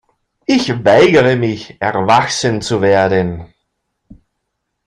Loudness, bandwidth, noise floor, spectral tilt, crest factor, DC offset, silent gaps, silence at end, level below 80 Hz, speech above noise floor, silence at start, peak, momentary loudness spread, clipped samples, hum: -13 LUFS; 11 kHz; -72 dBFS; -5 dB/octave; 14 dB; under 0.1%; none; 1.4 s; -48 dBFS; 60 dB; 0.5 s; 0 dBFS; 11 LU; under 0.1%; none